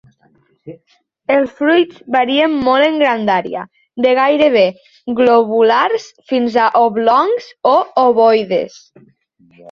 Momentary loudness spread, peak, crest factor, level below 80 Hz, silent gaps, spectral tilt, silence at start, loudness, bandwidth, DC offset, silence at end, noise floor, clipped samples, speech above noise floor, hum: 9 LU; 0 dBFS; 14 dB; -58 dBFS; none; -5.5 dB/octave; 0.65 s; -13 LUFS; 7.2 kHz; under 0.1%; 0 s; -55 dBFS; under 0.1%; 42 dB; none